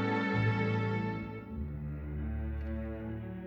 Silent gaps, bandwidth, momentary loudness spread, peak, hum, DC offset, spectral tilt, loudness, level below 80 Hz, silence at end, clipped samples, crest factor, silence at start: none; 6.6 kHz; 10 LU; -20 dBFS; none; under 0.1%; -8.5 dB/octave; -35 LUFS; -44 dBFS; 0 s; under 0.1%; 14 dB; 0 s